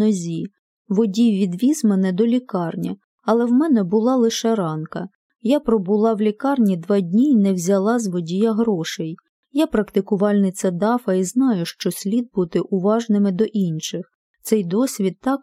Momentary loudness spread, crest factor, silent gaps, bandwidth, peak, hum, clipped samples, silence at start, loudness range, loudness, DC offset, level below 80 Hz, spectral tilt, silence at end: 11 LU; 16 dB; 0.59-0.85 s, 3.04-3.18 s, 5.15-5.30 s, 9.29-9.43 s, 14.15-14.34 s; 15.5 kHz; -4 dBFS; none; under 0.1%; 0 s; 2 LU; -20 LUFS; under 0.1%; -58 dBFS; -6.5 dB/octave; 0.05 s